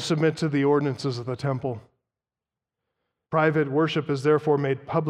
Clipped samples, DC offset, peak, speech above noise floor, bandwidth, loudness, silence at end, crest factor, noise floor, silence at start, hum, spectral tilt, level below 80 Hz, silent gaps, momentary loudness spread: under 0.1%; under 0.1%; -8 dBFS; 66 dB; 11 kHz; -24 LUFS; 0 s; 18 dB; -90 dBFS; 0 s; none; -6.5 dB/octave; -66 dBFS; none; 8 LU